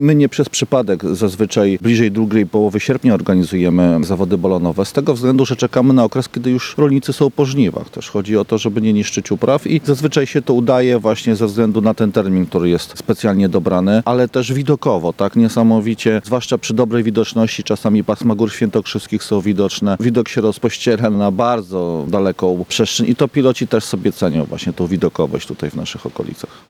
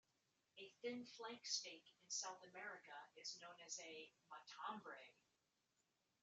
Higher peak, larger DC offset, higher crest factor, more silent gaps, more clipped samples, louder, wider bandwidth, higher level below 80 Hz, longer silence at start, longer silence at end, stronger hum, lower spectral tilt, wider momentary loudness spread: first, -2 dBFS vs -32 dBFS; neither; second, 14 dB vs 24 dB; neither; neither; first, -15 LUFS vs -53 LUFS; first, 15.5 kHz vs 8 kHz; first, -50 dBFS vs under -90 dBFS; second, 0 s vs 0.55 s; second, 0.25 s vs 1.1 s; neither; first, -6 dB/octave vs 0 dB/octave; second, 6 LU vs 15 LU